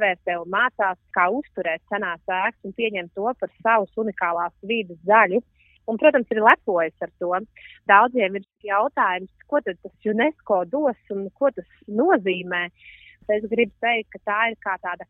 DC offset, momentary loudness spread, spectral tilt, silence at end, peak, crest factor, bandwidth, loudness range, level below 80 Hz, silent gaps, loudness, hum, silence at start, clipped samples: under 0.1%; 12 LU; -7.5 dB/octave; 0.05 s; 0 dBFS; 22 dB; 4 kHz; 4 LU; -64 dBFS; none; -22 LUFS; none; 0 s; under 0.1%